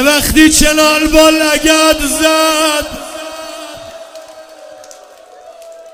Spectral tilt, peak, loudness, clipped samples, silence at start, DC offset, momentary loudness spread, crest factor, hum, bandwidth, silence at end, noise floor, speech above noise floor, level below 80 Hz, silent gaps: -2 dB/octave; 0 dBFS; -9 LUFS; 0.9%; 0 s; under 0.1%; 20 LU; 12 dB; none; over 20 kHz; 0.05 s; -37 dBFS; 28 dB; -28 dBFS; none